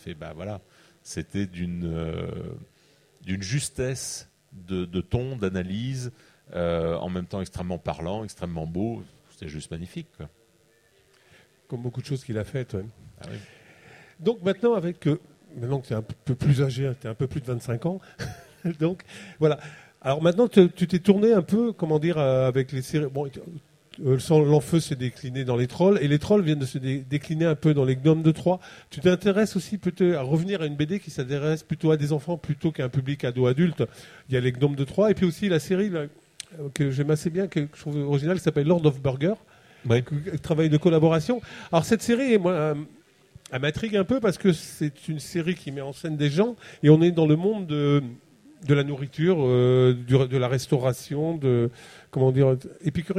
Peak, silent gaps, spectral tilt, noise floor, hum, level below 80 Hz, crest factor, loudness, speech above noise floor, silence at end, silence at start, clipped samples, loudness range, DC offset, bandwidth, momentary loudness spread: -4 dBFS; none; -7 dB/octave; -62 dBFS; none; -54 dBFS; 22 dB; -25 LUFS; 38 dB; 0 s; 0.05 s; under 0.1%; 10 LU; under 0.1%; 14.5 kHz; 16 LU